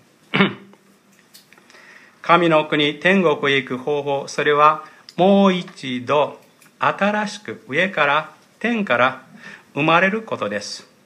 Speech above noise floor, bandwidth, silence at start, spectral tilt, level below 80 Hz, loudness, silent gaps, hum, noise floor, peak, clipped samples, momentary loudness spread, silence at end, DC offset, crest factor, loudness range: 35 dB; 11 kHz; 0.35 s; -5.5 dB/octave; -72 dBFS; -18 LUFS; none; none; -54 dBFS; 0 dBFS; under 0.1%; 15 LU; 0.25 s; under 0.1%; 20 dB; 3 LU